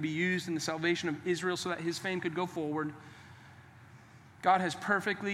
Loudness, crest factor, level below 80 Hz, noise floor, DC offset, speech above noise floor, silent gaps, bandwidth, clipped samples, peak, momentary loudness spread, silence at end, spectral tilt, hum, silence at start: -32 LUFS; 20 dB; -78 dBFS; -55 dBFS; under 0.1%; 23 dB; none; 15 kHz; under 0.1%; -14 dBFS; 11 LU; 0 s; -4.5 dB/octave; none; 0 s